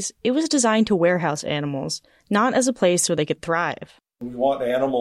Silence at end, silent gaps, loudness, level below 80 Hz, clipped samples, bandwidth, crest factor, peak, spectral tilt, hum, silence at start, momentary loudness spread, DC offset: 0 s; none; -21 LUFS; -58 dBFS; under 0.1%; 14 kHz; 14 dB; -8 dBFS; -4 dB/octave; none; 0 s; 10 LU; under 0.1%